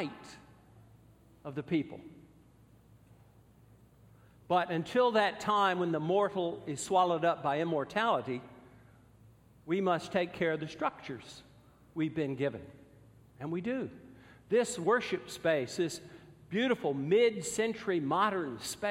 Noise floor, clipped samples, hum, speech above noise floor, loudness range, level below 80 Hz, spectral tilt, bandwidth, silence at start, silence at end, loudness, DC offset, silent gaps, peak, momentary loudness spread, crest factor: -61 dBFS; under 0.1%; none; 29 dB; 9 LU; -68 dBFS; -5 dB/octave; 16 kHz; 0 s; 0 s; -32 LUFS; under 0.1%; none; -14 dBFS; 16 LU; 20 dB